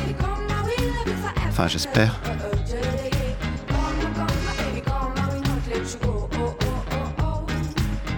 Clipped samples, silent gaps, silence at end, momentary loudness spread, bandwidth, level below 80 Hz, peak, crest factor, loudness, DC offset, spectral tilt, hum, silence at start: under 0.1%; none; 0 s; 4 LU; 18 kHz; -30 dBFS; -4 dBFS; 20 dB; -25 LUFS; under 0.1%; -5.5 dB/octave; none; 0 s